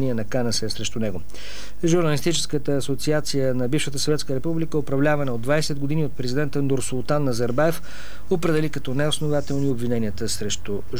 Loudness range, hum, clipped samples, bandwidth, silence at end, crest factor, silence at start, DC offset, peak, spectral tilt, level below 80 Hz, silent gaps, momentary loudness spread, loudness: 1 LU; none; under 0.1%; 19.5 kHz; 0 s; 16 dB; 0 s; 7%; -6 dBFS; -5 dB/octave; -44 dBFS; none; 6 LU; -24 LUFS